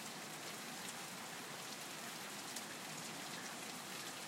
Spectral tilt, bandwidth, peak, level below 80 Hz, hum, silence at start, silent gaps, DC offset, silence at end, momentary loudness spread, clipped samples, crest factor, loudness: -1.5 dB/octave; 16 kHz; -24 dBFS; -90 dBFS; none; 0 s; none; under 0.1%; 0 s; 1 LU; under 0.1%; 24 dB; -46 LUFS